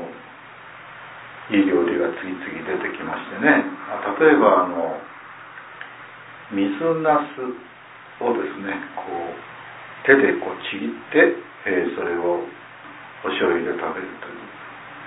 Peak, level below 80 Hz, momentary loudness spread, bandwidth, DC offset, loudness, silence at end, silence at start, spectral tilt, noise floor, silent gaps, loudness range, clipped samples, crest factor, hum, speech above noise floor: 0 dBFS; -66 dBFS; 22 LU; 4 kHz; under 0.1%; -21 LUFS; 0 s; 0 s; -9.5 dB/octave; -42 dBFS; none; 5 LU; under 0.1%; 22 dB; none; 21 dB